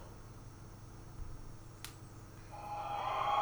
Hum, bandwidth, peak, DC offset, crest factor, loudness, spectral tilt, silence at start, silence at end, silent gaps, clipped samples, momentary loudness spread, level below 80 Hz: none; over 20 kHz; -22 dBFS; under 0.1%; 20 dB; -44 LUFS; -4.5 dB/octave; 0 s; 0 s; none; under 0.1%; 16 LU; -54 dBFS